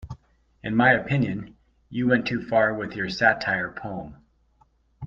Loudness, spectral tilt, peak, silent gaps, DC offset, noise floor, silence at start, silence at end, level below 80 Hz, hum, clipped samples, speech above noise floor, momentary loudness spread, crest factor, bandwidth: -23 LUFS; -7 dB/octave; -4 dBFS; none; under 0.1%; -63 dBFS; 0 s; 0 s; -54 dBFS; none; under 0.1%; 39 dB; 19 LU; 22 dB; 7.4 kHz